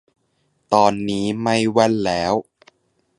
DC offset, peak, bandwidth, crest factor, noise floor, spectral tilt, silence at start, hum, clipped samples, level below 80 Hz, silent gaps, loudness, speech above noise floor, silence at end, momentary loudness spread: under 0.1%; 0 dBFS; 11.5 kHz; 20 dB; -67 dBFS; -5 dB/octave; 0.7 s; none; under 0.1%; -52 dBFS; none; -19 LUFS; 49 dB; 0.75 s; 6 LU